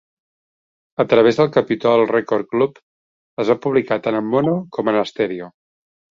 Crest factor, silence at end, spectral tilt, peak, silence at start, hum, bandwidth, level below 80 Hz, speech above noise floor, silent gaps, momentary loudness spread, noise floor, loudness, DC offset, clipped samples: 18 dB; 0.65 s; -7 dB/octave; -2 dBFS; 1 s; none; 7.4 kHz; -60 dBFS; over 73 dB; 2.83-3.37 s; 9 LU; under -90 dBFS; -18 LUFS; under 0.1%; under 0.1%